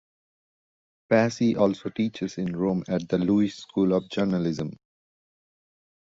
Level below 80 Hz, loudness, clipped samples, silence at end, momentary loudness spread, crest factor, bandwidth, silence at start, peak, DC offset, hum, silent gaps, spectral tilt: -60 dBFS; -25 LUFS; under 0.1%; 1.4 s; 7 LU; 20 dB; 7.8 kHz; 1.1 s; -6 dBFS; under 0.1%; none; none; -7 dB/octave